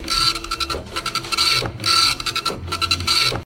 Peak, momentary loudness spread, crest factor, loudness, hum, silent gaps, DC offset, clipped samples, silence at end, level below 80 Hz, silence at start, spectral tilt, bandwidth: -4 dBFS; 9 LU; 18 dB; -18 LUFS; none; none; under 0.1%; under 0.1%; 0 s; -40 dBFS; 0 s; -1.5 dB/octave; 17 kHz